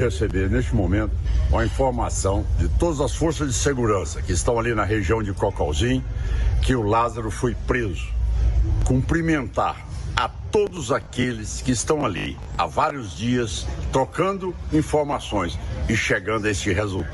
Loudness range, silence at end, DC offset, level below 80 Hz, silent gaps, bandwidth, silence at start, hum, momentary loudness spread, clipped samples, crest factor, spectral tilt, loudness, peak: 2 LU; 0 s; under 0.1%; -28 dBFS; none; 11.5 kHz; 0 s; none; 5 LU; under 0.1%; 18 dB; -5.5 dB/octave; -23 LUFS; -4 dBFS